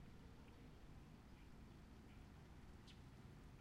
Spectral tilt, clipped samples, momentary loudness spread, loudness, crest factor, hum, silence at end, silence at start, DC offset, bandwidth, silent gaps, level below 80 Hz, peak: -6 dB/octave; under 0.1%; 1 LU; -63 LUFS; 12 dB; none; 0 s; 0 s; under 0.1%; 15 kHz; none; -66 dBFS; -50 dBFS